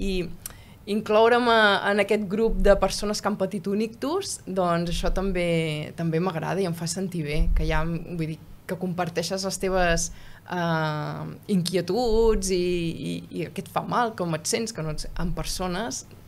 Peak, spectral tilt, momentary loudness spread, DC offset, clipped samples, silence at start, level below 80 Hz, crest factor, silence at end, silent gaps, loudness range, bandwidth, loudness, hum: -4 dBFS; -4.5 dB/octave; 12 LU; under 0.1%; under 0.1%; 0 s; -34 dBFS; 20 dB; 0 s; none; 6 LU; 16 kHz; -25 LUFS; none